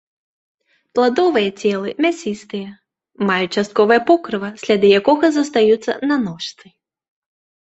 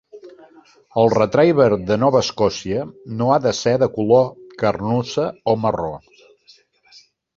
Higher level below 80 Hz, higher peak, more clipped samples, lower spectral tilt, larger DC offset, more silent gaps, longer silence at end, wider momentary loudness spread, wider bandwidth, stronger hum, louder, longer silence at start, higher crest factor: second, -62 dBFS vs -50 dBFS; about the same, -2 dBFS vs -2 dBFS; neither; about the same, -5 dB/octave vs -6 dB/octave; neither; neither; second, 1.15 s vs 1.4 s; about the same, 13 LU vs 11 LU; about the same, 8.2 kHz vs 7.6 kHz; neither; about the same, -17 LUFS vs -18 LUFS; first, 0.95 s vs 0.15 s; about the same, 16 dB vs 18 dB